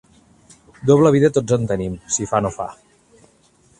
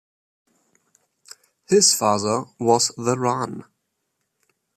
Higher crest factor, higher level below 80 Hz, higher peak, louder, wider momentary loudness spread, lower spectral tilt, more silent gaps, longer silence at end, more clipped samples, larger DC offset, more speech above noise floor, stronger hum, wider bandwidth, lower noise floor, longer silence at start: about the same, 20 dB vs 20 dB; first, -48 dBFS vs -68 dBFS; first, 0 dBFS vs -4 dBFS; about the same, -18 LUFS vs -20 LUFS; about the same, 12 LU vs 12 LU; first, -6 dB/octave vs -3 dB/octave; neither; about the same, 1.05 s vs 1.15 s; neither; neither; second, 38 dB vs 56 dB; neither; second, 11 kHz vs 15 kHz; second, -55 dBFS vs -76 dBFS; second, 0.85 s vs 1.7 s